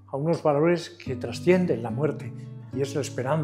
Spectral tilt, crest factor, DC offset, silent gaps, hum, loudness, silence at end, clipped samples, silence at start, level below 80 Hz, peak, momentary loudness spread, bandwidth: -7 dB/octave; 18 dB; under 0.1%; none; none; -26 LUFS; 0 s; under 0.1%; 0.1 s; -64 dBFS; -6 dBFS; 14 LU; 13 kHz